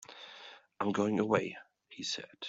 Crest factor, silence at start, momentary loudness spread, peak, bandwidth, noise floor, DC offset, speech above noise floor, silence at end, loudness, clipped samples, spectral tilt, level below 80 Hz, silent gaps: 24 dB; 0.1 s; 20 LU; -12 dBFS; 8 kHz; -54 dBFS; under 0.1%; 21 dB; 0 s; -34 LUFS; under 0.1%; -4.5 dB/octave; -74 dBFS; none